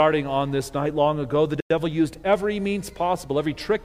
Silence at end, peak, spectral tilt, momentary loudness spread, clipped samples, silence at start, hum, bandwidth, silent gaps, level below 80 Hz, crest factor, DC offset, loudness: 0 s; -6 dBFS; -6 dB/octave; 4 LU; under 0.1%; 0 s; none; 16 kHz; 1.62-1.70 s; -48 dBFS; 18 dB; under 0.1%; -24 LUFS